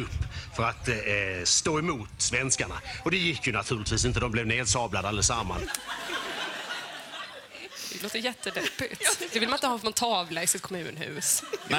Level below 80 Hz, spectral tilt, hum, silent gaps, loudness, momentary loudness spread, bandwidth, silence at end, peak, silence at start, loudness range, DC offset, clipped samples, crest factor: -46 dBFS; -2.5 dB/octave; none; none; -28 LUFS; 10 LU; 18 kHz; 0 s; -6 dBFS; 0 s; 5 LU; under 0.1%; under 0.1%; 24 dB